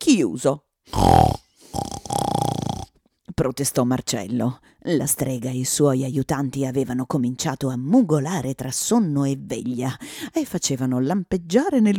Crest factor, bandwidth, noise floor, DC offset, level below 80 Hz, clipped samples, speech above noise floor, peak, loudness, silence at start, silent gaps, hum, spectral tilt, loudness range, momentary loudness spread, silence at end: 22 dB; 18.5 kHz; -43 dBFS; under 0.1%; -42 dBFS; under 0.1%; 22 dB; 0 dBFS; -22 LUFS; 0 s; none; none; -5.5 dB/octave; 2 LU; 12 LU; 0 s